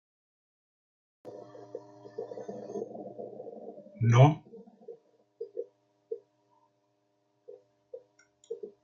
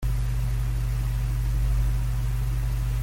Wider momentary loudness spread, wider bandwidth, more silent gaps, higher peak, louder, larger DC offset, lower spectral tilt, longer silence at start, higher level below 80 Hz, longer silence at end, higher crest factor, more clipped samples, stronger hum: first, 28 LU vs 2 LU; second, 7 kHz vs 16.5 kHz; neither; first, -8 dBFS vs -14 dBFS; about the same, -30 LUFS vs -28 LUFS; neither; first, -7.5 dB/octave vs -6 dB/octave; first, 1.25 s vs 0 s; second, -74 dBFS vs -26 dBFS; first, 0.15 s vs 0 s; first, 26 dB vs 10 dB; neither; neither